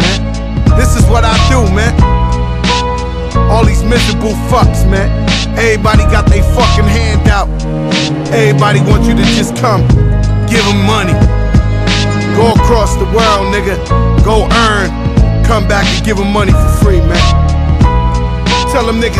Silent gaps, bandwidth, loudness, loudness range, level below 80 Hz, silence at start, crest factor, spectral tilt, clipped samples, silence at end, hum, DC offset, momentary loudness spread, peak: none; 14 kHz; -10 LUFS; 1 LU; -14 dBFS; 0 s; 8 dB; -5.5 dB/octave; 0.6%; 0 s; none; under 0.1%; 4 LU; 0 dBFS